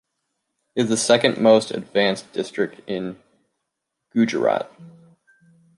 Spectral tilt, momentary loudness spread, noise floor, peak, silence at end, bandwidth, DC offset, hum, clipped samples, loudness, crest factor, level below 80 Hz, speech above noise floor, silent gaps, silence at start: -4 dB/octave; 13 LU; -80 dBFS; -2 dBFS; 0.9 s; 11.5 kHz; under 0.1%; none; under 0.1%; -21 LUFS; 20 dB; -68 dBFS; 59 dB; none; 0.75 s